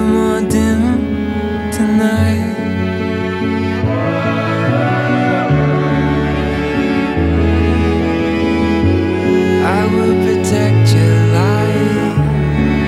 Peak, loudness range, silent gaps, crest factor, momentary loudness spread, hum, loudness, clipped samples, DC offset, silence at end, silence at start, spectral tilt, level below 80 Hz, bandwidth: 0 dBFS; 3 LU; none; 12 dB; 6 LU; none; -14 LUFS; under 0.1%; under 0.1%; 0 s; 0 s; -7 dB/octave; -28 dBFS; 13.5 kHz